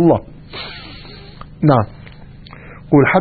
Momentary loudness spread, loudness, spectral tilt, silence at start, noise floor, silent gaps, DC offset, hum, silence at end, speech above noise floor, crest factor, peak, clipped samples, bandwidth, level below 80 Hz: 25 LU; -16 LUFS; -12 dB/octave; 0 s; -37 dBFS; none; under 0.1%; none; 0 s; 24 dB; 18 dB; 0 dBFS; under 0.1%; 4.8 kHz; -42 dBFS